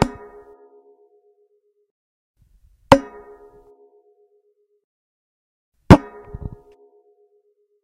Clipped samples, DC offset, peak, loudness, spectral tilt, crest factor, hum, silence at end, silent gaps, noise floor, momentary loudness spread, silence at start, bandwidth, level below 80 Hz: 0.1%; under 0.1%; 0 dBFS; -15 LUFS; -7 dB/octave; 24 dB; none; 1.85 s; 1.91-2.34 s, 4.84-5.72 s; -64 dBFS; 26 LU; 0 s; 16 kHz; -38 dBFS